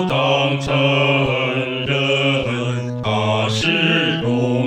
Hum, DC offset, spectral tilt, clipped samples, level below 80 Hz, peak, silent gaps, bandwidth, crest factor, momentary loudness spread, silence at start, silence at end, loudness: none; under 0.1%; -5.5 dB/octave; under 0.1%; -48 dBFS; -4 dBFS; none; 10 kHz; 14 dB; 6 LU; 0 s; 0 s; -17 LUFS